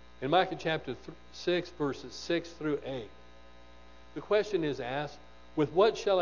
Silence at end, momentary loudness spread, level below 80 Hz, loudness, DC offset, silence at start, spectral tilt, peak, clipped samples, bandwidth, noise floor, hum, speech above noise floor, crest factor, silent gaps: 0 s; 16 LU; -60 dBFS; -32 LUFS; 0.2%; 0.2 s; -5.5 dB/octave; -12 dBFS; under 0.1%; 7.4 kHz; -55 dBFS; 60 Hz at -60 dBFS; 24 dB; 20 dB; none